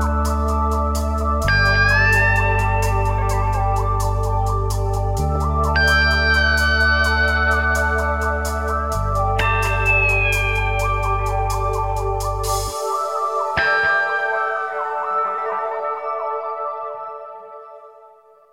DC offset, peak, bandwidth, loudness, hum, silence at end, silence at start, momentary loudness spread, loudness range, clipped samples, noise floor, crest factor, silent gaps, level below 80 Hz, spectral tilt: 0.2%; -4 dBFS; 16.5 kHz; -19 LUFS; none; 0.45 s; 0 s; 9 LU; 6 LU; under 0.1%; -48 dBFS; 16 dB; none; -26 dBFS; -4.5 dB/octave